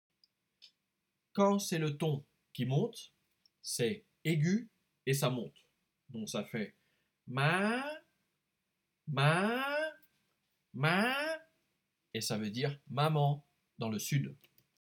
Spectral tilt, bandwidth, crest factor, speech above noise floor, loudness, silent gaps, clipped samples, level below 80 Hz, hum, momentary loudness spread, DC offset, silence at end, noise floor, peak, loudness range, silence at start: -5 dB/octave; 18.5 kHz; 20 dB; 52 dB; -34 LUFS; none; under 0.1%; -84 dBFS; none; 14 LU; under 0.1%; 0.5 s; -85 dBFS; -16 dBFS; 3 LU; 1.35 s